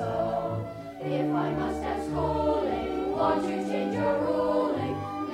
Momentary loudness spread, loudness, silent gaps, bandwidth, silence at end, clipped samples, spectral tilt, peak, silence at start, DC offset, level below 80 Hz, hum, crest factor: 6 LU; -28 LUFS; none; 13 kHz; 0 s; under 0.1%; -7.5 dB/octave; -14 dBFS; 0 s; under 0.1%; -48 dBFS; none; 14 dB